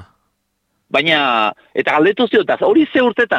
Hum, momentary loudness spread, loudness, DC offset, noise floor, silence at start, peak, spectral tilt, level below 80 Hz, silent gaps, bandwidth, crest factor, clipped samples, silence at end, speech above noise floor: none; 5 LU; -14 LUFS; under 0.1%; -69 dBFS; 0 s; -4 dBFS; -5.5 dB/octave; -60 dBFS; none; 8.4 kHz; 12 dB; under 0.1%; 0 s; 54 dB